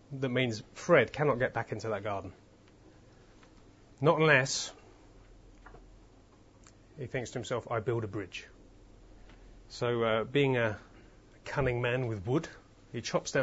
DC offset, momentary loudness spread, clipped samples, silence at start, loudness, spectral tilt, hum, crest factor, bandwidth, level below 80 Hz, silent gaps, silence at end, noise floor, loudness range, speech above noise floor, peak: under 0.1%; 17 LU; under 0.1%; 0.1 s; -31 LUFS; -4.5 dB/octave; none; 24 dB; 7.6 kHz; -58 dBFS; none; 0 s; -59 dBFS; 7 LU; 28 dB; -10 dBFS